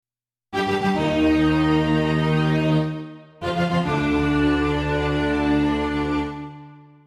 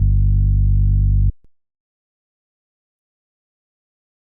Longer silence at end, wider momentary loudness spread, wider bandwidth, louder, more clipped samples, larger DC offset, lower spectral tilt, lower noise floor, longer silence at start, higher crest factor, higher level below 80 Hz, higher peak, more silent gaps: second, 0.3 s vs 2.9 s; first, 11 LU vs 3 LU; first, 11 kHz vs 0.5 kHz; second, -21 LUFS vs -18 LUFS; neither; neither; second, -7 dB/octave vs -15.5 dB/octave; second, -60 dBFS vs under -90 dBFS; first, 0.5 s vs 0 s; about the same, 14 dB vs 12 dB; second, -38 dBFS vs -20 dBFS; about the same, -8 dBFS vs -6 dBFS; neither